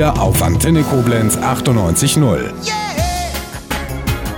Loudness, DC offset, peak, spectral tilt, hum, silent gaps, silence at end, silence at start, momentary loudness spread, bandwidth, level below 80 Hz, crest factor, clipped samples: -15 LUFS; under 0.1%; -2 dBFS; -5 dB/octave; none; none; 0 s; 0 s; 9 LU; 18 kHz; -26 dBFS; 12 dB; under 0.1%